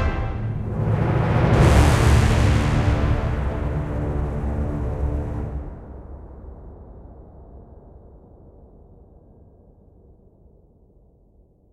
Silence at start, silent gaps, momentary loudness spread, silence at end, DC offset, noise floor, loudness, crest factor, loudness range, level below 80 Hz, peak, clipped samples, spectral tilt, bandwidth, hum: 0 s; none; 25 LU; 3.55 s; under 0.1%; -55 dBFS; -21 LUFS; 20 dB; 21 LU; -28 dBFS; -2 dBFS; under 0.1%; -7 dB/octave; 13 kHz; none